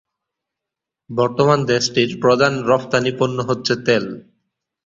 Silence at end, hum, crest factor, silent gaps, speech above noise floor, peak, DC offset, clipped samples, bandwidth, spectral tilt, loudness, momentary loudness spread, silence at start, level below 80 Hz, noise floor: 0.65 s; none; 18 dB; none; 67 dB; -2 dBFS; under 0.1%; under 0.1%; 7.6 kHz; -5 dB/octave; -17 LUFS; 6 LU; 1.1 s; -56 dBFS; -85 dBFS